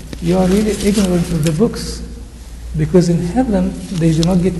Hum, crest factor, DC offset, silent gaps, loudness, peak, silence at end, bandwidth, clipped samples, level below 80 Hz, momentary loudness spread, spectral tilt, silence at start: none; 14 dB; under 0.1%; none; -15 LUFS; 0 dBFS; 0 s; 12.5 kHz; under 0.1%; -28 dBFS; 15 LU; -6.5 dB/octave; 0 s